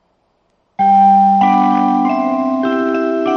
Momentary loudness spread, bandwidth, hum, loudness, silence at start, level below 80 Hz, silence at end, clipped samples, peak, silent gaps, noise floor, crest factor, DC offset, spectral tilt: 7 LU; 6.4 kHz; none; -13 LUFS; 0.8 s; -62 dBFS; 0 s; under 0.1%; -2 dBFS; none; -61 dBFS; 12 dB; under 0.1%; -8 dB/octave